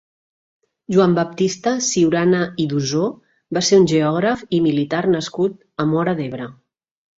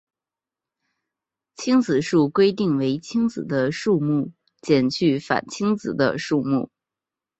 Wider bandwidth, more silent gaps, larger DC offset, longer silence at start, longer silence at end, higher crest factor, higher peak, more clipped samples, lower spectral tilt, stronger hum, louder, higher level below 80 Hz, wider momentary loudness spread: about the same, 7.8 kHz vs 8.2 kHz; neither; neither; second, 0.9 s vs 1.6 s; about the same, 0.65 s vs 0.75 s; about the same, 16 dB vs 20 dB; about the same, -2 dBFS vs -4 dBFS; neither; about the same, -5 dB/octave vs -6 dB/octave; neither; first, -18 LUFS vs -22 LUFS; about the same, -58 dBFS vs -62 dBFS; first, 9 LU vs 6 LU